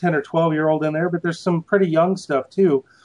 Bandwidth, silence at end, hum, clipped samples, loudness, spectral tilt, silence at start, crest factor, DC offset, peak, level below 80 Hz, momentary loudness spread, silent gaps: 10.5 kHz; 0.25 s; none; under 0.1%; -20 LUFS; -7.5 dB/octave; 0 s; 16 dB; under 0.1%; -4 dBFS; -70 dBFS; 5 LU; none